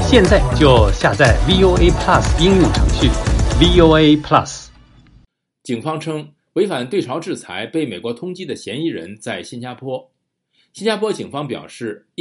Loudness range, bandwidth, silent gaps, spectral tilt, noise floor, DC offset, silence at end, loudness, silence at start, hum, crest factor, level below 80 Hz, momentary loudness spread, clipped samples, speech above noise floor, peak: 12 LU; 11.5 kHz; none; -5.5 dB/octave; -64 dBFS; under 0.1%; 0.25 s; -15 LUFS; 0 s; none; 16 dB; -24 dBFS; 17 LU; under 0.1%; 49 dB; 0 dBFS